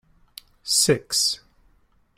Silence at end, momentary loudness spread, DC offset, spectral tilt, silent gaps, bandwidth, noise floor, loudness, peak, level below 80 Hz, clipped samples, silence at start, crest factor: 0.8 s; 15 LU; under 0.1%; -2 dB/octave; none; 16 kHz; -61 dBFS; -21 LUFS; -6 dBFS; -60 dBFS; under 0.1%; 0.65 s; 20 dB